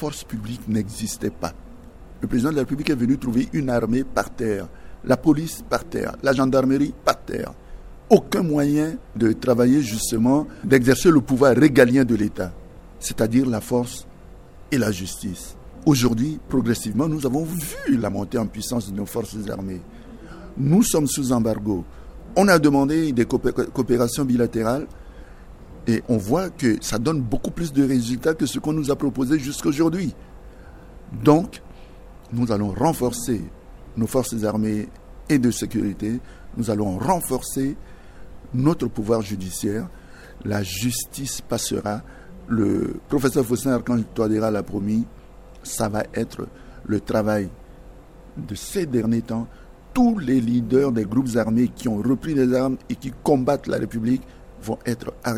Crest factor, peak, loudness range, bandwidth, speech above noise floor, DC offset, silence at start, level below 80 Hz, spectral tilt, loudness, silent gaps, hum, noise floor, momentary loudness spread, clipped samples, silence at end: 22 dB; 0 dBFS; 7 LU; 16 kHz; 22 dB; under 0.1%; 0 s; -42 dBFS; -6 dB/octave; -22 LUFS; none; none; -43 dBFS; 13 LU; under 0.1%; 0 s